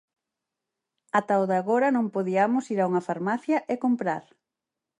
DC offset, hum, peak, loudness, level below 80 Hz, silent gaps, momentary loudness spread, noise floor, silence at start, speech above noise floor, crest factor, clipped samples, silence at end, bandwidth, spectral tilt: under 0.1%; none; -8 dBFS; -25 LUFS; -78 dBFS; none; 5 LU; -87 dBFS; 1.15 s; 63 dB; 18 dB; under 0.1%; 0.8 s; 10.5 kHz; -7 dB/octave